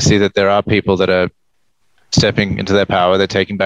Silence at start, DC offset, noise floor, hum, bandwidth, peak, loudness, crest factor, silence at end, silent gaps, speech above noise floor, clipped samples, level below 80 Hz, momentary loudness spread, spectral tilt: 0 s; 0.1%; -67 dBFS; none; 11 kHz; 0 dBFS; -14 LUFS; 14 dB; 0 s; none; 53 dB; under 0.1%; -42 dBFS; 4 LU; -5 dB/octave